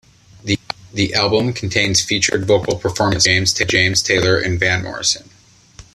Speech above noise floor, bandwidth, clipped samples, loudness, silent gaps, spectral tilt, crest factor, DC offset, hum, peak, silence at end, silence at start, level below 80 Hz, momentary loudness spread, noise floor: 27 dB; 14 kHz; under 0.1%; -16 LUFS; none; -3 dB/octave; 18 dB; under 0.1%; none; 0 dBFS; 0.15 s; 0.45 s; -44 dBFS; 9 LU; -44 dBFS